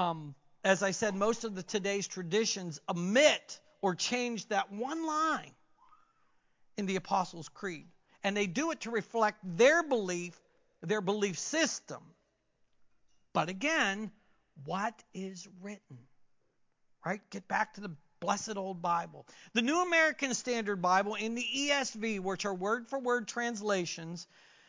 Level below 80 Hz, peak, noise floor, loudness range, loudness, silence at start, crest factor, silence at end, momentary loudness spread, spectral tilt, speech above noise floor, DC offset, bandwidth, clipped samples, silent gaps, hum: -76 dBFS; -10 dBFS; -74 dBFS; 7 LU; -32 LUFS; 0 s; 24 dB; 0.45 s; 17 LU; -3.5 dB/octave; 42 dB; under 0.1%; 7.8 kHz; under 0.1%; none; none